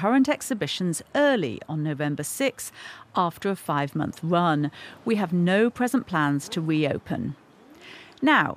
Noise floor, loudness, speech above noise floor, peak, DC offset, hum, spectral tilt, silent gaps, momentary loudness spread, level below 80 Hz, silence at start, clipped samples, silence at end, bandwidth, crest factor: -48 dBFS; -25 LUFS; 24 dB; -6 dBFS; under 0.1%; none; -5.5 dB/octave; none; 13 LU; -64 dBFS; 0 s; under 0.1%; 0 s; 15.5 kHz; 18 dB